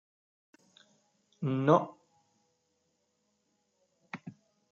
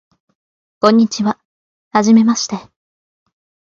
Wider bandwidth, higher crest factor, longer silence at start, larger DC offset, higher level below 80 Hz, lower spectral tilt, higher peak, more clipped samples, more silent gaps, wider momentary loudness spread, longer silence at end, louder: about the same, 7.4 kHz vs 7.4 kHz; first, 26 dB vs 16 dB; first, 1.4 s vs 0.85 s; neither; second, -86 dBFS vs -62 dBFS; first, -8 dB/octave vs -5 dB/octave; second, -12 dBFS vs 0 dBFS; neither; second, none vs 1.45-1.91 s; first, 21 LU vs 13 LU; second, 0.4 s vs 1 s; second, -29 LUFS vs -14 LUFS